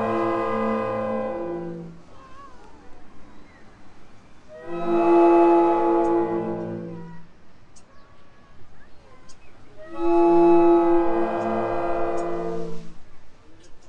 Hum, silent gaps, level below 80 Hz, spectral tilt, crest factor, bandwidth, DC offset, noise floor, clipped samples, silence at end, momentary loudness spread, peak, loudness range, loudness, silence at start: none; none; -48 dBFS; -8 dB/octave; 16 dB; 7 kHz; under 0.1%; -43 dBFS; under 0.1%; 0 s; 21 LU; -6 dBFS; 16 LU; -21 LUFS; 0 s